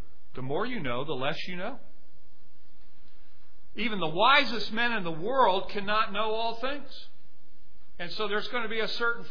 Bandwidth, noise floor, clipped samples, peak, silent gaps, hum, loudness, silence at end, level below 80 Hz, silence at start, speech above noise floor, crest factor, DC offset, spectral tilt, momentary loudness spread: 5.4 kHz; -63 dBFS; under 0.1%; -6 dBFS; none; none; -29 LUFS; 0 s; -58 dBFS; 0.35 s; 34 dB; 24 dB; 4%; -5.5 dB/octave; 17 LU